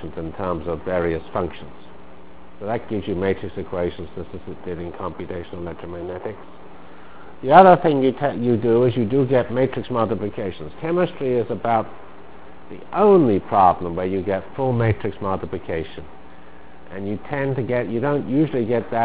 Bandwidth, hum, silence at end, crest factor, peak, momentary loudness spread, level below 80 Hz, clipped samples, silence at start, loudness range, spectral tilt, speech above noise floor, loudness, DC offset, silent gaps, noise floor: 4 kHz; none; 0 s; 22 dB; 0 dBFS; 17 LU; -46 dBFS; under 0.1%; 0 s; 11 LU; -11.5 dB/octave; 24 dB; -21 LUFS; 2%; none; -45 dBFS